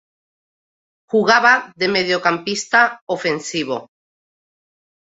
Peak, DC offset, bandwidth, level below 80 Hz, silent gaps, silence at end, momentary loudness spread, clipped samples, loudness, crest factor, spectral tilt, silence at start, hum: -2 dBFS; under 0.1%; 8.2 kHz; -66 dBFS; 3.01-3.07 s; 1.2 s; 10 LU; under 0.1%; -17 LUFS; 18 dB; -3 dB/octave; 1.15 s; none